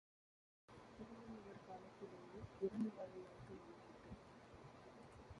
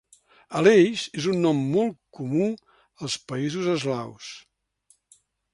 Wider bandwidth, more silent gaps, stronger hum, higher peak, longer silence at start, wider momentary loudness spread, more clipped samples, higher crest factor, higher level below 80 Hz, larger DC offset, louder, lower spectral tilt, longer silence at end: about the same, 11 kHz vs 11.5 kHz; neither; neither; second, -32 dBFS vs -4 dBFS; first, 0.7 s vs 0.5 s; second, 15 LU vs 19 LU; neither; about the same, 22 dB vs 20 dB; second, -72 dBFS vs -66 dBFS; neither; second, -54 LUFS vs -24 LUFS; first, -7.5 dB/octave vs -5.5 dB/octave; second, 0 s vs 1.15 s